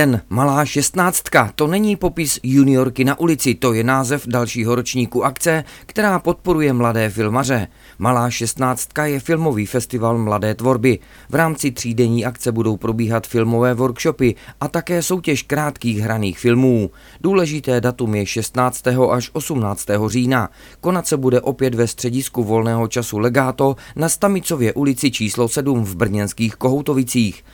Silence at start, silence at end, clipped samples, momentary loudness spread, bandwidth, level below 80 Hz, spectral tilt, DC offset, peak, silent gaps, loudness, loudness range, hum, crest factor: 0 s; 0.15 s; under 0.1%; 5 LU; 19 kHz; -44 dBFS; -5.5 dB/octave; under 0.1%; 0 dBFS; none; -18 LUFS; 3 LU; none; 18 dB